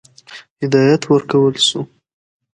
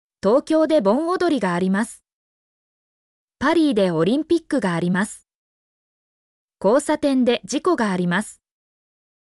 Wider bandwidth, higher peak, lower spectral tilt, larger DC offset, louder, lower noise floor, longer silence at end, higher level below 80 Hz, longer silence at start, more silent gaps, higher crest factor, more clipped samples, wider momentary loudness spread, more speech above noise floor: about the same, 11 kHz vs 12 kHz; first, 0 dBFS vs -6 dBFS; about the same, -5 dB/octave vs -6 dB/octave; neither; first, -14 LUFS vs -20 LUFS; second, -40 dBFS vs under -90 dBFS; second, 0.7 s vs 0.9 s; about the same, -62 dBFS vs -60 dBFS; about the same, 0.3 s vs 0.25 s; second, 0.50-0.56 s vs 2.13-3.28 s, 5.35-6.48 s; about the same, 16 dB vs 14 dB; neither; first, 13 LU vs 6 LU; second, 26 dB vs over 71 dB